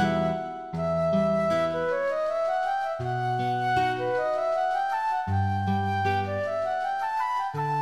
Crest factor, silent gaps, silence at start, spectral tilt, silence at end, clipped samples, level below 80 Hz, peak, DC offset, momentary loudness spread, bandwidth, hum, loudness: 12 dB; none; 0 s; -7 dB/octave; 0 s; under 0.1%; -56 dBFS; -14 dBFS; 0.2%; 4 LU; 12.5 kHz; none; -27 LUFS